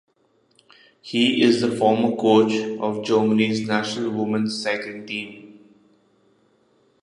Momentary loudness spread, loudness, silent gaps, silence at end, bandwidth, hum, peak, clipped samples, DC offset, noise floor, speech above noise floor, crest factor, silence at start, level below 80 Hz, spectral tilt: 12 LU; -21 LUFS; none; 1.5 s; 11 kHz; none; -4 dBFS; under 0.1%; under 0.1%; -63 dBFS; 43 dB; 18 dB; 1.05 s; -68 dBFS; -5 dB/octave